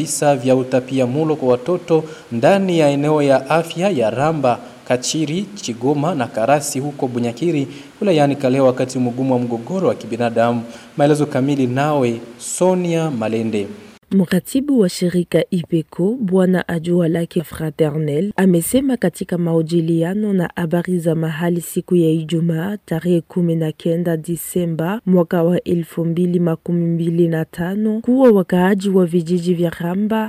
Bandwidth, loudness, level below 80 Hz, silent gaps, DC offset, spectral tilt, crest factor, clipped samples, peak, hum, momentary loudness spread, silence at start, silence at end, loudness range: 16 kHz; -18 LUFS; -54 dBFS; none; under 0.1%; -6.5 dB/octave; 14 dB; under 0.1%; -2 dBFS; none; 7 LU; 0 s; 0 s; 3 LU